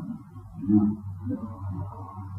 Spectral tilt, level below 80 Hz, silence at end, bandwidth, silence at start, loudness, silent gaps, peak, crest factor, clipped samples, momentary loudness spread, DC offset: -12 dB/octave; -54 dBFS; 0 s; 2.1 kHz; 0 s; -29 LUFS; none; -10 dBFS; 18 dB; under 0.1%; 17 LU; under 0.1%